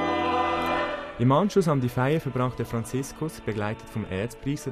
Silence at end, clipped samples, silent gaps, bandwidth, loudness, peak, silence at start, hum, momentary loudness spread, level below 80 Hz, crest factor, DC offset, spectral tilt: 0 s; under 0.1%; none; 14.5 kHz; -26 LUFS; -10 dBFS; 0 s; none; 9 LU; -50 dBFS; 16 dB; under 0.1%; -6.5 dB/octave